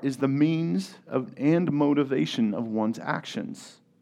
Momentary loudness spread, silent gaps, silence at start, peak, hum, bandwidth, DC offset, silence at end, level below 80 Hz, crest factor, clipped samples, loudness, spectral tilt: 10 LU; none; 0 s; -10 dBFS; none; 12 kHz; under 0.1%; 0.3 s; -78 dBFS; 16 dB; under 0.1%; -26 LUFS; -7 dB/octave